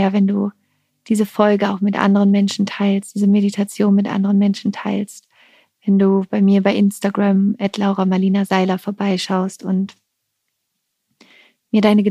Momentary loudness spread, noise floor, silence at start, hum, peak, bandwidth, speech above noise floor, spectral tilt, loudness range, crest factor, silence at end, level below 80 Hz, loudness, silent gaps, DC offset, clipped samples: 7 LU; -74 dBFS; 0 s; none; 0 dBFS; 13.5 kHz; 58 dB; -7 dB/octave; 4 LU; 16 dB; 0 s; -68 dBFS; -17 LUFS; none; under 0.1%; under 0.1%